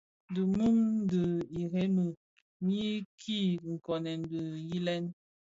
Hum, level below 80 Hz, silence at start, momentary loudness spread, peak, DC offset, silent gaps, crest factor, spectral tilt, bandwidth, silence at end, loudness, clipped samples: none; -64 dBFS; 0.3 s; 10 LU; -20 dBFS; under 0.1%; 2.17-2.60 s, 3.05-3.18 s; 12 dB; -7.5 dB/octave; 7.8 kHz; 0.35 s; -33 LUFS; under 0.1%